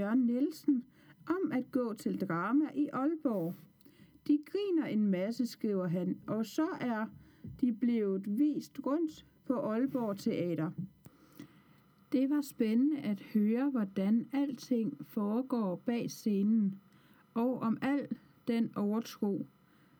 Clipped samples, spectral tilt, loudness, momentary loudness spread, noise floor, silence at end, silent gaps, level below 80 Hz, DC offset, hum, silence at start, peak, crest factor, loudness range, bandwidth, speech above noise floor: under 0.1%; -7.5 dB/octave; -34 LUFS; 8 LU; -64 dBFS; 0.55 s; none; -76 dBFS; under 0.1%; none; 0 s; -20 dBFS; 14 dB; 3 LU; over 20 kHz; 31 dB